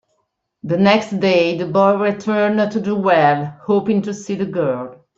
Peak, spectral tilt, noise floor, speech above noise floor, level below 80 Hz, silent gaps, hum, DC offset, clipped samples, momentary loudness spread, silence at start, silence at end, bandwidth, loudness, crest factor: -2 dBFS; -6.5 dB/octave; -70 dBFS; 53 dB; -60 dBFS; none; none; under 0.1%; under 0.1%; 9 LU; 0.65 s; 0.25 s; 7.6 kHz; -17 LUFS; 16 dB